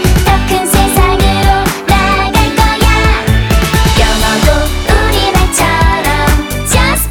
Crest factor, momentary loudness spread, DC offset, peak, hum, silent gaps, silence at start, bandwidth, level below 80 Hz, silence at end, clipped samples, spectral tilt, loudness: 10 dB; 2 LU; under 0.1%; 0 dBFS; none; none; 0 s; 19 kHz; -14 dBFS; 0 s; 0.2%; -4 dB/octave; -10 LUFS